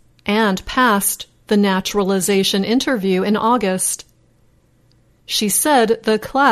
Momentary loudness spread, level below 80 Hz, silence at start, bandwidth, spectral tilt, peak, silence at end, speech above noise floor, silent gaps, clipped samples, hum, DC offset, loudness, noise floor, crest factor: 6 LU; -48 dBFS; 0.25 s; 13.5 kHz; -3.5 dB/octave; -4 dBFS; 0 s; 39 dB; none; under 0.1%; none; under 0.1%; -17 LUFS; -55 dBFS; 14 dB